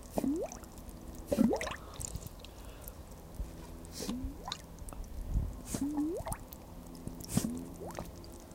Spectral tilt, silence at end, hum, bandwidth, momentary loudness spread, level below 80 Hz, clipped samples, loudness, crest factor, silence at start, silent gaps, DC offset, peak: -5 dB/octave; 0 s; none; 16.5 kHz; 14 LU; -46 dBFS; under 0.1%; -39 LUFS; 24 dB; 0 s; none; under 0.1%; -14 dBFS